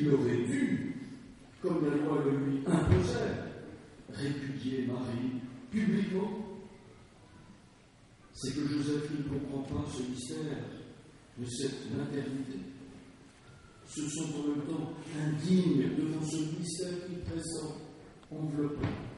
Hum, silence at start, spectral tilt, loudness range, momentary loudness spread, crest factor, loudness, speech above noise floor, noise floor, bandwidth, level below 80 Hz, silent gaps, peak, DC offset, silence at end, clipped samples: none; 0 s; -6.5 dB/octave; 7 LU; 19 LU; 22 dB; -34 LUFS; 27 dB; -59 dBFS; 11.5 kHz; -56 dBFS; none; -12 dBFS; under 0.1%; 0 s; under 0.1%